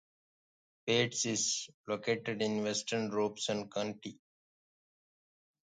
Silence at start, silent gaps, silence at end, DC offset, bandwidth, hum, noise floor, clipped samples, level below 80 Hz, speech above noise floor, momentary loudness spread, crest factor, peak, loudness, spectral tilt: 0.85 s; 1.74-1.84 s; 1.6 s; under 0.1%; 9.6 kHz; none; under -90 dBFS; under 0.1%; -78 dBFS; over 55 dB; 9 LU; 22 dB; -14 dBFS; -34 LUFS; -3 dB/octave